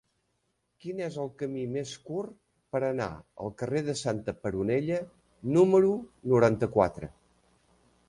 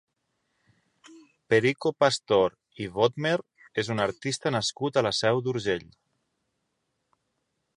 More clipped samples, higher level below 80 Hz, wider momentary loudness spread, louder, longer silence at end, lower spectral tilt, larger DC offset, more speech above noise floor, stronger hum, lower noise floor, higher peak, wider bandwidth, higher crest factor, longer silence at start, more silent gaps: neither; first, -58 dBFS vs -64 dBFS; first, 16 LU vs 8 LU; second, -29 LUFS vs -26 LUFS; second, 1 s vs 1.95 s; first, -7 dB/octave vs -4.5 dB/octave; neither; second, 48 dB vs 52 dB; neither; about the same, -77 dBFS vs -78 dBFS; about the same, -8 dBFS vs -6 dBFS; about the same, 11 kHz vs 11.5 kHz; about the same, 22 dB vs 22 dB; second, 0.85 s vs 1.1 s; neither